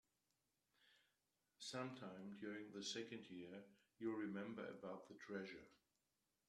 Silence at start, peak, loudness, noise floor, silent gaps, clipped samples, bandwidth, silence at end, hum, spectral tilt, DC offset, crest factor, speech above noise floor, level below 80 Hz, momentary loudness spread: 0.8 s; -34 dBFS; -53 LUFS; -90 dBFS; none; under 0.1%; 12.5 kHz; 0.7 s; none; -4.5 dB/octave; under 0.1%; 20 dB; 38 dB; under -90 dBFS; 8 LU